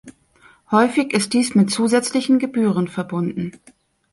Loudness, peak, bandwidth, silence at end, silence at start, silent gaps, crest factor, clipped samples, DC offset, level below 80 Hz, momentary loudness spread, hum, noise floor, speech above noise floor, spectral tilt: -19 LUFS; -2 dBFS; 11.5 kHz; 0.65 s; 0.05 s; none; 18 dB; under 0.1%; under 0.1%; -62 dBFS; 7 LU; none; -53 dBFS; 35 dB; -5 dB/octave